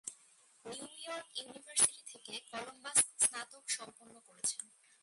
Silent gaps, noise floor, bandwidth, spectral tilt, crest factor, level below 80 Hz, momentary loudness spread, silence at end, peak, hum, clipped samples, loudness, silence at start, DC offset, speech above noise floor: none; -66 dBFS; 12 kHz; 1 dB/octave; 26 dB; -84 dBFS; 18 LU; 0.35 s; -14 dBFS; none; under 0.1%; -35 LUFS; 0.05 s; under 0.1%; 27 dB